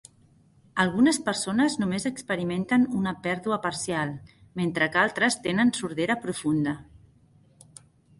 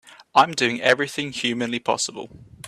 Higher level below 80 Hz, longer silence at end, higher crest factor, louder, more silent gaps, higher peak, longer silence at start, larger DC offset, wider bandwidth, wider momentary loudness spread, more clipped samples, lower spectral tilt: about the same, -60 dBFS vs -62 dBFS; first, 1.2 s vs 0 s; about the same, 20 dB vs 20 dB; second, -26 LUFS vs -21 LUFS; neither; second, -6 dBFS vs -2 dBFS; first, 0.75 s vs 0.05 s; neither; second, 11.5 kHz vs 14 kHz; about the same, 8 LU vs 9 LU; neither; first, -4.5 dB/octave vs -3 dB/octave